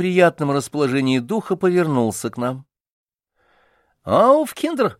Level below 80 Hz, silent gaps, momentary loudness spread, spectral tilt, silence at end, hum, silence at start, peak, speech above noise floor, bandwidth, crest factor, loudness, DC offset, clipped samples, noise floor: -62 dBFS; 2.92-3.06 s; 11 LU; -6 dB/octave; 0.05 s; none; 0 s; -2 dBFS; 47 dB; 15.5 kHz; 16 dB; -19 LUFS; under 0.1%; under 0.1%; -65 dBFS